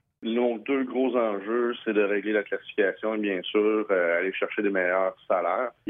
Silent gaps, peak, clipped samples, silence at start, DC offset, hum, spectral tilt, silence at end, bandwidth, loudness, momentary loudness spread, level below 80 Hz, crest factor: none; -10 dBFS; under 0.1%; 0.2 s; under 0.1%; none; -8.5 dB/octave; 0 s; 3.8 kHz; -26 LUFS; 4 LU; -78 dBFS; 16 dB